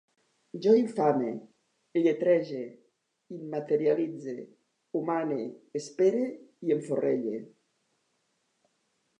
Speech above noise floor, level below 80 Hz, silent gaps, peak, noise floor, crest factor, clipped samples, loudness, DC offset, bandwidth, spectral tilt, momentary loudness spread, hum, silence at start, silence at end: 48 dB; -86 dBFS; none; -10 dBFS; -76 dBFS; 20 dB; under 0.1%; -29 LUFS; under 0.1%; 10 kHz; -7 dB/octave; 16 LU; none; 0.55 s; 1.75 s